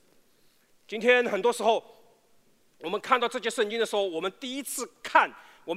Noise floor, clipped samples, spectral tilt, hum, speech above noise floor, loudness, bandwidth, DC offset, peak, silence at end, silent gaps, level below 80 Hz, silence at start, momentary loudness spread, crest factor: -63 dBFS; under 0.1%; -2.5 dB/octave; none; 36 dB; -27 LUFS; 16 kHz; under 0.1%; -6 dBFS; 0 s; none; -80 dBFS; 0.9 s; 12 LU; 22 dB